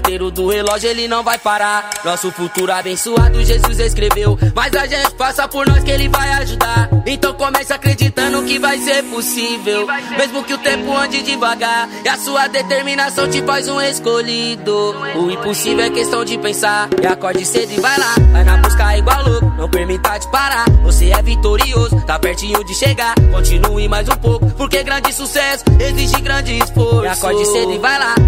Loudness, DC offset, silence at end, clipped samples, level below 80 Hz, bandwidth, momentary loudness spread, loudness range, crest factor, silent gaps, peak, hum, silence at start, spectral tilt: -14 LUFS; under 0.1%; 0 s; under 0.1%; -18 dBFS; 16.5 kHz; 5 LU; 3 LU; 14 dB; none; 0 dBFS; none; 0 s; -4.5 dB/octave